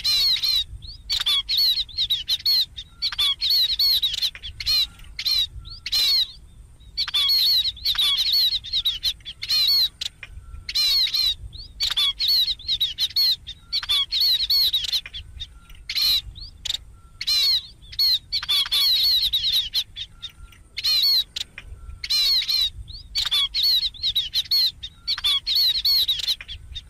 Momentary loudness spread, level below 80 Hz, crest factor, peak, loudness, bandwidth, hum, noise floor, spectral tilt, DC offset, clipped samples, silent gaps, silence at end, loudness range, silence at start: 15 LU; -46 dBFS; 12 dB; -12 dBFS; -19 LUFS; 16 kHz; none; -45 dBFS; 1 dB/octave; under 0.1%; under 0.1%; none; 0.1 s; 2 LU; 0 s